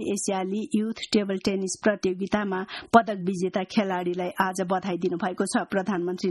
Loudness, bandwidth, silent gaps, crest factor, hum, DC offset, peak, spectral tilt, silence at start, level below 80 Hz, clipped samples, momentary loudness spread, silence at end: -26 LUFS; 12 kHz; none; 24 dB; none; under 0.1%; -2 dBFS; -5 dB/octave; 0 s; -62 dBFS; under 0.1%; 7 LU; 0 s